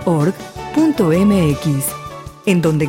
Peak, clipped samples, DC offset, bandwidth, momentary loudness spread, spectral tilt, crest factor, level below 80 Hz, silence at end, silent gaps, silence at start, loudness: -4 dBFS; under 0.1%; under 0.1%; 17 kHz; 13 LU; -6.5 dB/octave; 12 dB; -40 dBFS; 0 s; none; 0 s; -16 LUFS